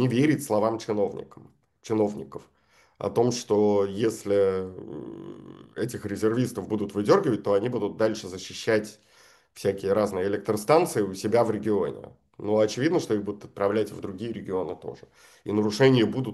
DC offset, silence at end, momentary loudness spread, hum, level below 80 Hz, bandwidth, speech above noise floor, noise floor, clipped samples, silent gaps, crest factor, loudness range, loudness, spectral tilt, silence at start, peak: under 0.1%; 0 s; 17 LU; none; -66 dBFS; 12.5 kHz; 32 dB; -58 dBFS; under 0.1%; none; 20 dB; 3 LU; -26 LUFS; -6 dB/octave; 0 s; -6 dBFS